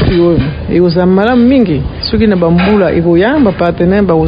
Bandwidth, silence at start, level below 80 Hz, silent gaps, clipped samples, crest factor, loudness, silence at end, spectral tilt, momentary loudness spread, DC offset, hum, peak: 5.2 kHz; 0 s; -24 dBFS; none; 0.3%; 8 dB; -9 LUFS; 0 s; -10.5 dB/octave; 5 LU; under 0.1%; none; 0 dBFS